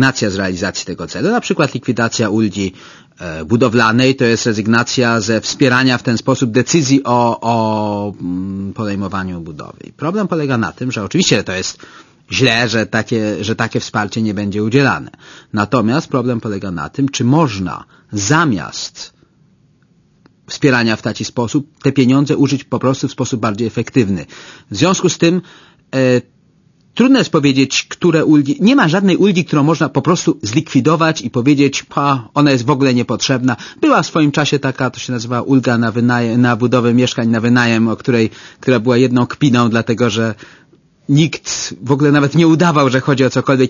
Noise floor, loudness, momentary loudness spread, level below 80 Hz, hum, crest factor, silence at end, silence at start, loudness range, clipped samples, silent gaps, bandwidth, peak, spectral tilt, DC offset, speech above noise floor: -53 dBFS; -14 LUFS; 10 LU; -50 dBFS; none; 14 dB; 0 s; 0 s; 5 LU; under 0.1%; none; 7.4 kHz; 0 dBFS; -5.5 dB/octave; under 0.1%; 39 dB